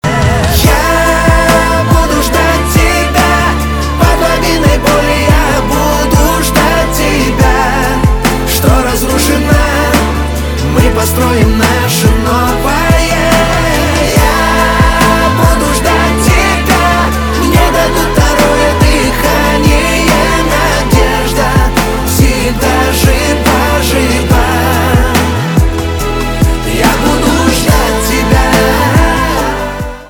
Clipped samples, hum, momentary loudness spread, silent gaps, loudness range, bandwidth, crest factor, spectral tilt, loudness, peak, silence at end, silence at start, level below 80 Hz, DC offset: 0.3%; none; 3 LU; none; 1 LU; over 20 kHz; 8 dB; -4.5 dB/octave; -9 LUFS; 0 dBFS; 0 s; 0.05 s; -14 dBFS; 0.4%